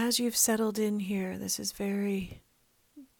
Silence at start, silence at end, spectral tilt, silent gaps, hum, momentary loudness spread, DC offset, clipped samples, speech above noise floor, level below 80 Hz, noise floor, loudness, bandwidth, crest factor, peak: 0 s; 0.15 s; -3.5 dB/octave; none; none; 8 LU; under 0.1%; under 0.1%; 39 dB; -62 dBFS; -69 dBFS; -30 LUFS; over 20 kHz; 22 dB; -10 dBFS